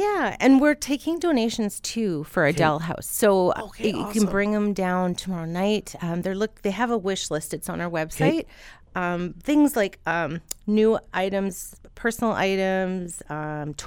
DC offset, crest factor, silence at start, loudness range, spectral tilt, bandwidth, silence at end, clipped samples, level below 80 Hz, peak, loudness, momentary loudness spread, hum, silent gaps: under 0.1%; 18 dB; 0 s; 4 LU; -5 dB/octave; 19 kHz; 0 s; under 0.1%; -48 dBFS; -6 dBFS; -24 LUFS; 10 LU; none; none